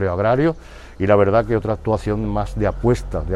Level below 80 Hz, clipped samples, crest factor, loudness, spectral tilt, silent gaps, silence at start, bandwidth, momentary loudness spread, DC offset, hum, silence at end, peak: -32 dBFS; under 0.1%; 16 dB; -19 LUFS; -8 dB/octave; none; 0 s; 12 kHz; 7 LU; under 0.1%; none; 0 s; -2 dBFS